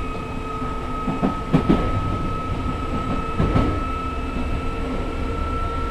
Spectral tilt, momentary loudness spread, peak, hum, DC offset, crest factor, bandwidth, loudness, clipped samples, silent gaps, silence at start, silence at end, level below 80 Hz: -7.5 dB/octave; 7 LU; -4 dBFS; none; under 0.1%; 20 dB; 12 kHz; -24 LUFS; under 0.1%; none; 0 s; 0 s; -28 dBFS